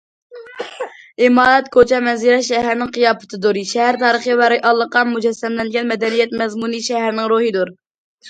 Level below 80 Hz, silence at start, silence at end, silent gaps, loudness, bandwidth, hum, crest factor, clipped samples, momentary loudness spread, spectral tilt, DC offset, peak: -54 dBFS; 0.3 s; 0 s; 7.91-8.18 s; -15 LUFS; 9.2 kHz; none; 16 dB; under 0.1%; 12 LU; -3.5 dB/octave; under 0.1%; 0 dBFS